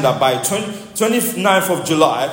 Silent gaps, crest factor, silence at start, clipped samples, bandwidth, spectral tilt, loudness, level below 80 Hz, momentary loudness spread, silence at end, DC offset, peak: none; 16 dB; 0 s; under 0.1%; 16.5 kHz; -3.5 dB/octave; -16 LUFS; -58 dBFS; 5 LU; 0 s; under 0.1%; 0 dBFS